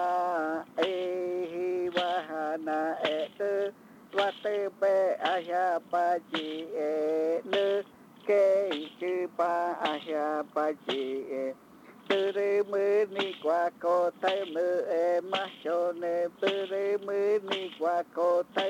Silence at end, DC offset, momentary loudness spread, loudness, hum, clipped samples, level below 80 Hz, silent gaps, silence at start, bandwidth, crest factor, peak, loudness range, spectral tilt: 0 s; under 0.1%; 6 LU; -30 LUFS; none; under 0.1%; -82 dBFS; none; 0 s; 16 kHz; 16 dB; -14 dBFS; 3 LU; -4.5 dB/octave